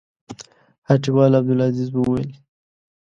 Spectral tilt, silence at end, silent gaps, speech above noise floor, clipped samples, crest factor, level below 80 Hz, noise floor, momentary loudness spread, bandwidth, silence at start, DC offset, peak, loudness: -8.5 dB/octave; 0.8 s; 0.78-0.82 s; 23 dB; under 0.1%; 20 dB; -52 dBFS; -40 dBFS; 23 LU; 7.6 kHz; 0.3 s; under 0.1%; 0 dBFS; -18 LUFS